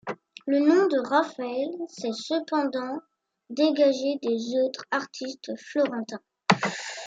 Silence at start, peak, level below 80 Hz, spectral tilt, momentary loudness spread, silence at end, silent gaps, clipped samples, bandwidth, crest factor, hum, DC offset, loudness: 0.05 s; -2 dBFS; -78 dBFS; -5 dB/octave; 14 LU; 0 s; none; under 0.1%; 8 kHz; 24 dB; none; under 0.1%; -26 LUFS